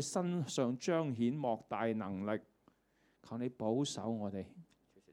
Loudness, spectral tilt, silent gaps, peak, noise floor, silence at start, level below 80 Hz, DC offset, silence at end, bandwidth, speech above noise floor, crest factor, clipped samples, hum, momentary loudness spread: -38 LUFS; -5.5 dB/octave; none; -22 dBFS; -75 dBFS; 0 s; -80 dBFS; under 0.1%; 0.5 s; 13 kHz; 37 dB; 16 dB; under 0.1%; none; 8 LU